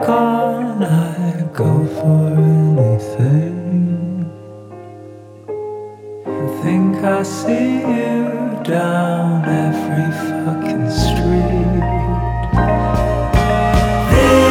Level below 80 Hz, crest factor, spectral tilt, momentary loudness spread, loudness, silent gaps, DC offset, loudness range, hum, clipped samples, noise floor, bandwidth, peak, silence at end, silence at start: -26 dBFS; 16 dB; -7 dB/octave; 14 LU; -16 LUFS; none; under 0.1%; 6 LU; none; under 0.1%; -36 dBFS; 16 kHz; 0 dBFS; 0 s; 0 s